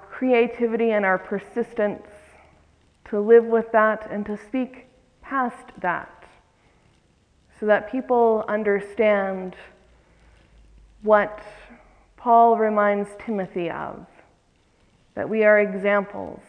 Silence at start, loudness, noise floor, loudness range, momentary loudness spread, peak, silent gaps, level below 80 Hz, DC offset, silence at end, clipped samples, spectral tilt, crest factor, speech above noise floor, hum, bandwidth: 0.1 s; -22 LUFS; -61 dBFS; 6 LU; 16 LU; -4 dBFS; none; -58 dBFS; under 0.1%; 0.15 s; under 0.1%; -7.5 dB/octave; 20 dB; 40 dB; none; 9.4 kHz